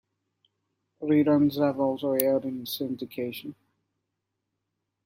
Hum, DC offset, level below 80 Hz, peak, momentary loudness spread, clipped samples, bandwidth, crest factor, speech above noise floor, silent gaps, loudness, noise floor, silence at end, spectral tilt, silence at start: none; under 0.1%; -70 dBFS; -2 dBFS; 13 LU; under 0.1%; 16 kHz; 26 dB; 57 dB; none; -26 LUFS; -82 dBFS; 1.55 s; -6 dB/octave; 1 s